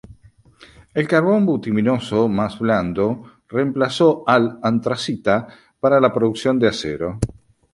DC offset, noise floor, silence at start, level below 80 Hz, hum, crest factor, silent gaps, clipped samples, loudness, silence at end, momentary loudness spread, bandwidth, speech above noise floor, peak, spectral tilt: under 0.1%; -50 dBFS; 0.1 s; -46 dBFS; none; 18 dB; none; under 0.1%; -19 LUFS; 0.4 s; 9 LU; 11.5 kHz; 32 dB; -2 dBFS; -6.5 dB/octave